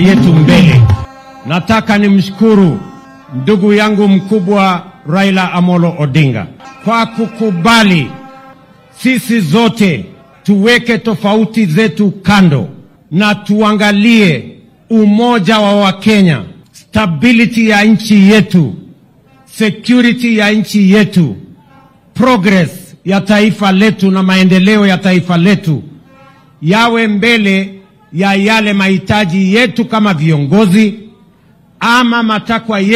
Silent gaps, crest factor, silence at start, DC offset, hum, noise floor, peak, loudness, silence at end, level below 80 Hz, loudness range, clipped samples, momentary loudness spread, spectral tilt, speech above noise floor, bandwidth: none; 10 dB; 0 s; under 0.1%; none; -45 dBFS; 0 dBFS; -9 LUFS; 0 s; -42 dBFS; 2 LU; 0.3%; 10 LU; -6.5 dB/octave; 36 dB; 14.5 kHz